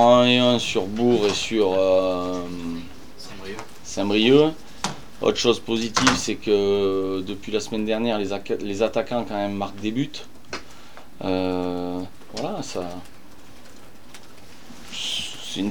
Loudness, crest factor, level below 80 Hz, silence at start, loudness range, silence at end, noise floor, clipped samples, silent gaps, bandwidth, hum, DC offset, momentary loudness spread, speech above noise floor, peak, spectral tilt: -23 LUFS; 22 dB; -52 dBFS; 0 s; 10 LU; 0 s; -48 dBFS; under 0.1%; none; 19.5 kHz; none; 2%; 18 LU; 26 dB; 0 dBFS; -4 dB/octave